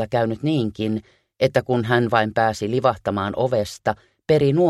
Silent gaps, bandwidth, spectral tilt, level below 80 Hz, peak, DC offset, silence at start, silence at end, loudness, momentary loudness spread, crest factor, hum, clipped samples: none; 13.5 kHz; -6.5 dB/octave; -52 dBFS; -2 dBFS; under 0.1%; 0 s; 0 s; -21 LUFS; 7 LU; 18 dB; none; under 0.1%